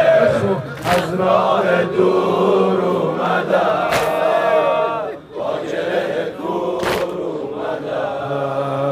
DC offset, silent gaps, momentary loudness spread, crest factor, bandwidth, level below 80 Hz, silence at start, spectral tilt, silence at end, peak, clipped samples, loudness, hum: under 0.1%; none; 9 LU; 14 dB; 16 kHz; -52 dBFS; 0 s; -6 dB/octave; 0 s; -2 dBFS; under 0.1%; -18 LUFS; none